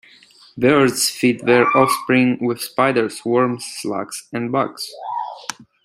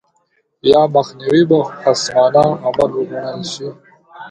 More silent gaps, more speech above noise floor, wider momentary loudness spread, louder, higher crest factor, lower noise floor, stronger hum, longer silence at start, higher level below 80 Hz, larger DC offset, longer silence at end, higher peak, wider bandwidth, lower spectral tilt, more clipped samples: neither; second, 30 dB vs 48 dB; about the same, 12 LU vs 12 LU; second, -18 LUFS vs -15 LUFS; about the same, 18 dB vs 16 dB; second, -48 dBFS vs -62 dBFS; neither; about the same, 0.55 s vs 0.65 s; second, -60 dBFS vs -52 dBFS; neither; first, 0.2 s vs 0 s; about the same, -2 dBFS vs 0 dBFS; first, 16 kHz vs 11 kHz; about the same, -4.5 dB/octave vs -5.5 dB/octave; neither